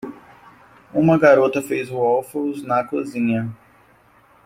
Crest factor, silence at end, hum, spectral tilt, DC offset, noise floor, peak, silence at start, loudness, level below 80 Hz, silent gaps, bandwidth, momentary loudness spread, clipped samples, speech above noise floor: 18 dB; 0.9 s; none; -7 dB/octave; under 0.1%; -54 dBFS; -2 dBFS; 0.05 s; -19 LUFS; -58 dBFS; none; 16 kHz; 12 LU; under 0.1%; 35 dB